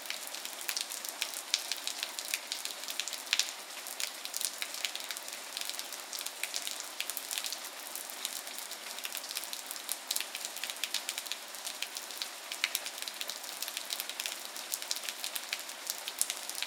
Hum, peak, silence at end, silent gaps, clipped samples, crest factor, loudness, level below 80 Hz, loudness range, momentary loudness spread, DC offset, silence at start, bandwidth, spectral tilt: none; -4 dBFS; 0 s; none; under 0.1%; 36 dB; -36 LUFS; under -90 dBFS; 3 LU; 6 LU; under 0.1%; 0 s; 19 kHz; 3 dB/octave